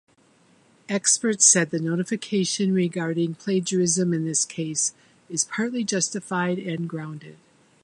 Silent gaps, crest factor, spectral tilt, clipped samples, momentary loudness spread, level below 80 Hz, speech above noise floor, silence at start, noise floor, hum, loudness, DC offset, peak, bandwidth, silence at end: none; 24 dB; -3.5 dB/octave; under 0.1%; 13 LU; -72 dBFS; 35 dB; 0.9 s; -59 dBFS; none; -23 LUFS; under 0.1%; -2 dBFS; 11.5 kHz; 0.5 s